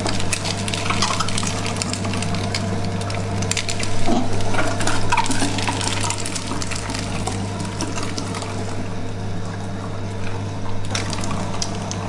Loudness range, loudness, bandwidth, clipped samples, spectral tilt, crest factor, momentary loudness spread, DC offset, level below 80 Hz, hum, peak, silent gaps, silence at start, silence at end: 5 LU; -23 LUFS; 11.5 kHz; under 0.1%; -4 dB/octave; 20 dB; 8 LU; under 0.1%; -32 dBFS; 50 Hz at -30 dBFS; 0 dBFS; none; 0 s; 0 s